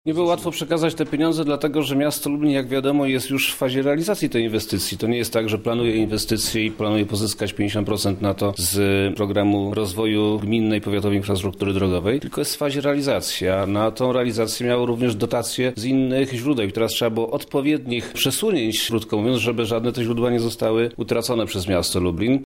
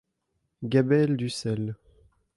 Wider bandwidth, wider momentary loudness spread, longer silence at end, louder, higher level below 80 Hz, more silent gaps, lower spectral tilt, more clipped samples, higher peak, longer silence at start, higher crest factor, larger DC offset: first, 16.5 kHz vs 11.5 kHz; second, 3 LU vs 15 LU; second, 0.05 s vs 0.6 s; first, -21 LUFS vs -26 LUFS; first, -48 dBFS vs -62 dBFS; neither; second, -5 dB/octave vs -7 dB/octave; neither; first, -6 dBFS vs -10 dBFS; second, 0.05 s vs 0.6 s; about the same, 14 dB vs 18 dB; neither